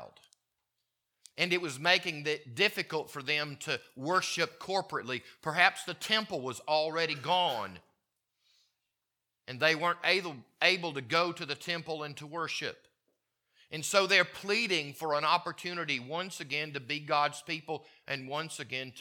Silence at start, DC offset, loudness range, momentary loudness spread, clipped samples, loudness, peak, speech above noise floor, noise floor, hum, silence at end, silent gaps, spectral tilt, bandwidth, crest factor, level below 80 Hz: 0 s; under 0.1%; 4 LU; 11 LU; under 0.1%; -31 LUFS; -6 dBFS; 54 dB; -87 dBFS; none; 0 s; none; -3 dB/octave; 19 kHz; 26 dB; -82 dBFS